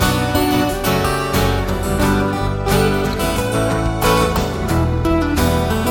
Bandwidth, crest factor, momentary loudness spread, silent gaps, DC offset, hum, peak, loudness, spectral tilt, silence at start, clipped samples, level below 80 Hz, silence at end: 17.5 kHz; 14 dB; 3 LU; none; under 0.1%; none; -2 dBFS; -17 LUFS; -5.5 dB/octave; 0 s; under 0.1%; -26 dBFS; 0 s